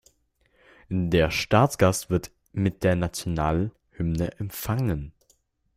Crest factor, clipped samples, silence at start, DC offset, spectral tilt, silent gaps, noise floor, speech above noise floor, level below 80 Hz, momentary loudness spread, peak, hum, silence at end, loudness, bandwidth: 20 dB; under 0.1%; 0.9 s; under 0.1%; -6 dB/octave; none; -67 dBFS; 43 dB; -44 dBFS; 11 LU; -6 dBFS; none; 0.65 s; -25 LUFS; 16 kHz